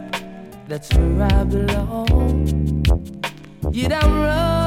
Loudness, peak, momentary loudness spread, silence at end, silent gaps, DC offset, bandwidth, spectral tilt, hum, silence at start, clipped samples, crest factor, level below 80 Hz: -20 LUFS; -2 dBFS; 12 LU; 0 s; none; under 0.1%; 15 kHz; -6.5 dB/octave; none; 0 s; under 0.1%; 16 dB; -22 dBFS